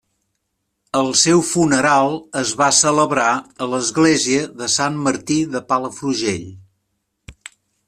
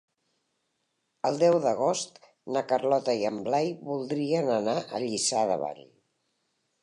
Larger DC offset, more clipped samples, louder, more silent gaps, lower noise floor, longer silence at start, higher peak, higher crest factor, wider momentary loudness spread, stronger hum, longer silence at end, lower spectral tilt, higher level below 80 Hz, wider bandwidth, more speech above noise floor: neither; neither; first, -17 LUFS vs -27 LUFS; neither; second, -74 dBFS vs -78 dBFS; second, 0.95 s vs 1.25 s; first, -2 dBFS vs -12 dBFS; about the same, 18 dB vs 18 dB; about the same, 9 LU vs 9 LU; neither; second, 0.55 s vs 1 s; about the same, -3 dB/octave vs -4 dB/octave; first, -56 dBFS vs -78 dBFS; first, 14 kHz vs 11 kHz; first, 56 dB vs 51 dB